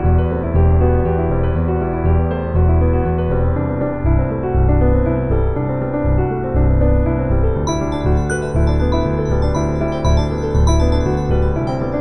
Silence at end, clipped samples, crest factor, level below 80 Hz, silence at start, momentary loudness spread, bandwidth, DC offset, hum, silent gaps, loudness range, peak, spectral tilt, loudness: 0 s; under 0.1%; 12 dB; -20 dBFS; 0 s; 4 LU; 9.4 kHz; 3%; none; none; 1 LU; -2 dBFS; -8 dB/octave; -17 LUFS